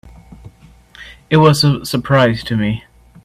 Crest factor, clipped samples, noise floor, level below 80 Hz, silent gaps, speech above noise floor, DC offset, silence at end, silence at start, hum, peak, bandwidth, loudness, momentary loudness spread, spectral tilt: 16 dB; under 0.1%; -44 dBFS; -42 dBFS; none; 31 dB; under 0.1%; 0.45 s; 0.05 s; none; 0 dBFS; 15.5 kHz; -14 LUFS; 9 LU; -6 dB/octave